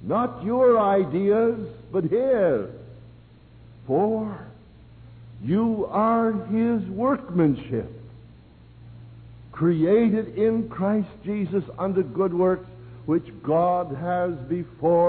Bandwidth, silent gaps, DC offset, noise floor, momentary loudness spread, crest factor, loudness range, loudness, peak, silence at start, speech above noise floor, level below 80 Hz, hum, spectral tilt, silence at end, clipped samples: 4.5 kHz; none; under 0.1%; -49 dBFS; 11 LU; 14 dB; 4 LU; -23 LUFS; -10 dBFS; 0 s; 27 dB; -54 dBFS; none; -12.5 dB/octave; 0 s; under 0.1%